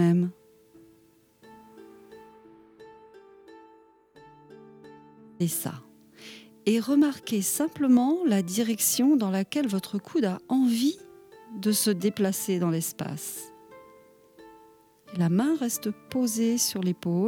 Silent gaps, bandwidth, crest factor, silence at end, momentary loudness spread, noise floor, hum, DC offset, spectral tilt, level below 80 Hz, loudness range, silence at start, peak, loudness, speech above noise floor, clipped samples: none; 20 kHz; 16 dB; 0 s; 14 LU; -61 dBFS; none; under 0.1%; -5 dB/octave; -72 dBFS; 13 LU; 0 s; -12 dBFS; -26 LUFS; 35 dB; under 0.1%